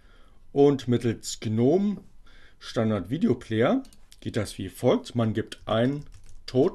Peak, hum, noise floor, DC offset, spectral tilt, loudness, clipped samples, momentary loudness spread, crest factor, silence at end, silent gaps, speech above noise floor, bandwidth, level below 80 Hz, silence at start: -8 dBFS; none; -49 dBFS; under 0.1%; -6.5 dB/octave; -26 LUFS; under 0.1%; 12 LU; 18 dB; 0 s; none; 24 dB; 13 kHz; -50 dBFS; 0.55 s